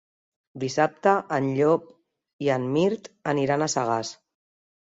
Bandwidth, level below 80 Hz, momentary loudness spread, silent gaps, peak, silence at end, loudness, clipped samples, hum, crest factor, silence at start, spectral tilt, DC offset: 8 kHz; -68 dBFS; 7 LU; 2.33-2.39 s; -6 dBFS; 0.7 s; -25 LUFS; under 0.1%; none; 20 dB; 0.55 s; -5.5 dB/octave; under 0.1%